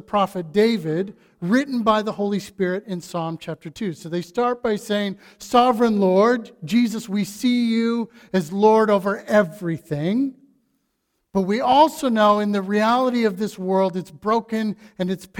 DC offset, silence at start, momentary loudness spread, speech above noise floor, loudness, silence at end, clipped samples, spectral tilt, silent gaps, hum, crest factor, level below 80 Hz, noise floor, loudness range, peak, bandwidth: under 0.1%; 0.1 s; 12 LU; 52 dB; -21 LUFS; 0 s; under 0.1%; -6 dB/octave; none; none; 18 dB; -60 dBFS; -73 dBFS; 5 LU; -2 dBFS; 17.5 kHz